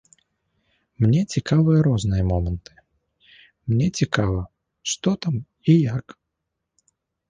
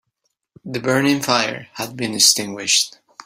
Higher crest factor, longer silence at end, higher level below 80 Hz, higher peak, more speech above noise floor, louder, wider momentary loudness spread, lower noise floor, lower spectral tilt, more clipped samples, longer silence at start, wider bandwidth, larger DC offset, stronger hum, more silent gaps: about the same, 20 dB vs 20 dB; first, 1.3 s vs 0.35 s; first, -40 dBFS vs -62 dBFS; second, -4 dBFS vs 0 dBFS; first, 60 dB vs 54 dB; second, -22 LUFS vs -17 LUFS; about the same, 13 LU vs 14 LU; first, -80 dBFS vs -73 dBFS; first, -6.5 dB/octave vs -2 dB/octave; neither; first, 1 s vs 0.65 s; second, 9.6 kHz vs 16 kHz; neither; neither; neither